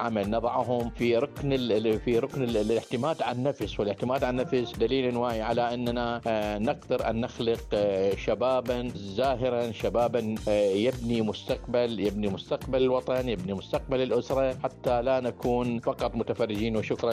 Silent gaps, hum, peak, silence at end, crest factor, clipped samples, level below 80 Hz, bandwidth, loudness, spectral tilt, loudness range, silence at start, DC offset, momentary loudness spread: none; none; -14 dBFS; 0 s; 14 dB; under 0.1%; -46 dBFS; 15.5 kHz; -28 LUFS; -6.5 dB/octave; 1 LU; 0 s; under 0.1%; 4 LU